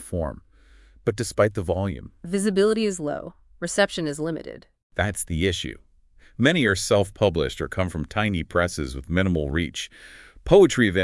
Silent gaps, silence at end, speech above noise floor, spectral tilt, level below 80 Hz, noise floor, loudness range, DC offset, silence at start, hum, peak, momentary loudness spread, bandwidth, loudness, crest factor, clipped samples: 4.83-4.90 s; 0 s; 31 dB; -5 dB/octave; -44 dBFS; -54 dBFS; 3 LU; under 0.1%; 0 s; none; -2 dBFS; 15 LU; 12 kHz; -23 LUFS; 22 dB; under 0.1%